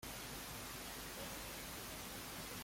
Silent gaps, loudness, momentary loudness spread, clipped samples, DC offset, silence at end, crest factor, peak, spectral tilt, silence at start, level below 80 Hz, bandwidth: none; -47 LUFS; 1 LU; under 0.1%; under 0.1%; 0 s; 14 dB; -36 dBFS; -2.5 dB/octave; 0 s; -62 dBFS; 16.5 kHz